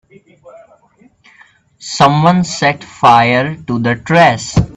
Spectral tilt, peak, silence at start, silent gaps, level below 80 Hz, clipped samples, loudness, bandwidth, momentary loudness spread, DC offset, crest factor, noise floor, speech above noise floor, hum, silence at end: -5.5 dB/octave; 0 dBFS; 0.45 s; none; -38 dBFS; under 0.1%; -11 LUFS; 8.8 kHz; 9 LU; under 0.1%; 14 dB; -50 dBFS; 38 dB; none; 0.05 s